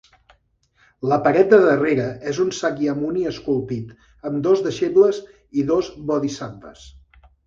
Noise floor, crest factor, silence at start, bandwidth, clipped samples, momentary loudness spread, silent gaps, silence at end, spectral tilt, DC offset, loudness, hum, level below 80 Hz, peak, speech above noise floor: -62 dBFS; 20 dB; 1 s; 7.6 kHz; under 0.1%; 17 LU; none; 0.55 s; -6 dB/octave; under 0.1%; -20 LUFS; none; -54 dBFS; 0 dBFS; 42 dB